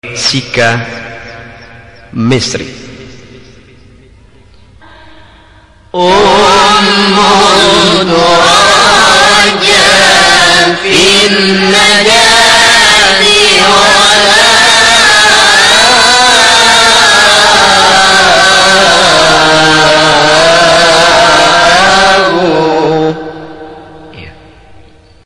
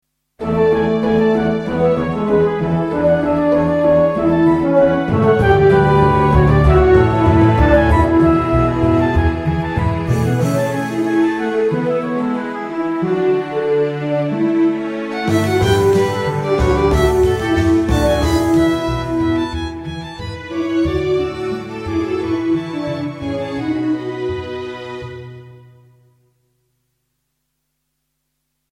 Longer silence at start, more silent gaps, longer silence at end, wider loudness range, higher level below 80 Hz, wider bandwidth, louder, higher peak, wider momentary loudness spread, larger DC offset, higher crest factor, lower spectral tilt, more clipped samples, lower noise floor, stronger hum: second, 0.05 s vs 0.4 s; neither; second, 0.45 s vs 3.15 s; about the same, 12 LU vs 10 LU; second, -36 dBFS vs -28 dBFS; about the same, 16 kHz vs 15 kHz; first, -4 LUFS vs -16 LUFS; about the same, 0 dBFS vs 0 dBFS; second, 8 LU vs 11 LU; first, 1% vs under 0.1%; second, 6 dB vs 16 dB; second, -2 dB/octave vs -7.5 dB/octave; first, 2% vs under 0.1%; second, -39 dBFS vs -72 dBFS; neither